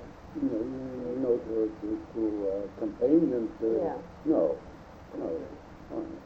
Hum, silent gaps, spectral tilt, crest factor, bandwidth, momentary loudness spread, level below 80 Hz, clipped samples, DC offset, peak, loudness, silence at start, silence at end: none; none; -9 dB/octave; 18 dB; 6.8 kHz; 16 LU; -56 dBFS; under 0.1%; under 0.1%; -12 dBFS; -31 LUFS; 0 s; 0 s